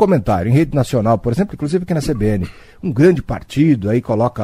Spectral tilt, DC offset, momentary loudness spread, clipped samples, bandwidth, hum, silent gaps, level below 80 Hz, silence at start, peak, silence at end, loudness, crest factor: -8 dB/octave; under 0.1%; 9 LU; under 0.1%; 15.5 kHz; none; none; -36 dBFS; 0 s; 0 dBFS; 0 s; -16 LUFS; 16 dB